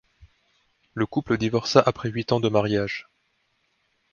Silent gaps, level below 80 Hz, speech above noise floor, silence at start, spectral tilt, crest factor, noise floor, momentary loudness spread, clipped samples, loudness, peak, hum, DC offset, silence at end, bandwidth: none; -56 dBFS; 48 dB; 0.2 s; -6 dB/octave; 24 dB; -70 dBFS; 11 LU; under 0.1%; -24 LUFS; 0 dBFS; none; under 0.1%; 1.1 s; 7.2 kHz